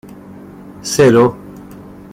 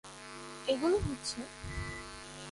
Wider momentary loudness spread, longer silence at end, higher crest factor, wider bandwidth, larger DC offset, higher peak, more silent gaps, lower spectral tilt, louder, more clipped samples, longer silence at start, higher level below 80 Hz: first, 26 LU vs 15 LU; first, 0.4 s vs 0 s; about the same, 14 dB vs 18 dB; first, 16 kHz vs 11.5 kHz; neither; first, -2 dBFS vs -18 dBFS; neither; about the same, -5.5 dB/octave vs -4.5 dB/octave; first, -12 LUFS vs -36 LUFS; neither; first, 0.3 s vs 0.05 s; about the same, -48 dBFS vs -50 dBFS